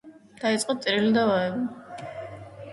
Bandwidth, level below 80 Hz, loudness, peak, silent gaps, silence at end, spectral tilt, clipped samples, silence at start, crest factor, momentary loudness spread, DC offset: 11.5 kHz; -64 dBFS; -25 LUFS; -10 dBFS; none; 0 s; -4.5 dB/octave; under 0.1%; 0.05 s; 16 dB; 18 LU; under 0.1%